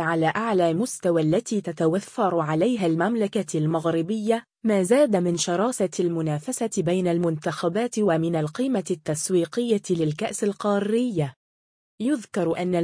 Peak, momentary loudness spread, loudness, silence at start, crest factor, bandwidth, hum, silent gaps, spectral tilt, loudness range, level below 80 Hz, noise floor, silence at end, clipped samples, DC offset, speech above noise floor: -8 dBFS; 4 LU; -24 LUFS; 0 s; 16 dB; 10.5 kHz; none; 11.36-11.98 s; -5.5 dB/octave; 2 LU; -66 dBFS; under -90 dBFS; 0 s; under 0.1%; under 0.1%; over 67 dB